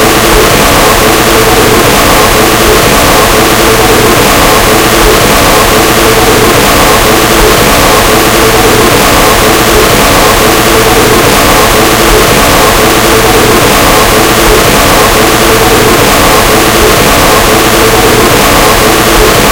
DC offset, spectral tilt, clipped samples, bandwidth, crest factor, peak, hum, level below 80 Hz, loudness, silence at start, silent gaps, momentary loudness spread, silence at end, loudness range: under 0.1%; -3 dB/octave; 20%; over 20 kHz; 4 dB; 0 dBFS; none; -16 dBFS; -3 LUFS; 0 s; none; 1 LU; 0 s; 0 LU